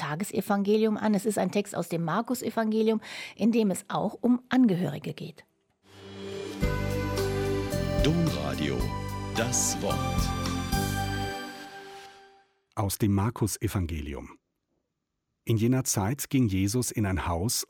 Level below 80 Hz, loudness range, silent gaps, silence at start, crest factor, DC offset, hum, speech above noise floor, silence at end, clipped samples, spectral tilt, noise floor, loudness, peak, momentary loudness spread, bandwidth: -42 dBFS; 5 LU; none; 0 s; 18 dB; under 0.1%; none; 55 dB; 0.05 s; under 0.1%; -5 dB/octave; -82 dBFS; -28 LUFS; -10 dBFS; 14 LU; 17 kHz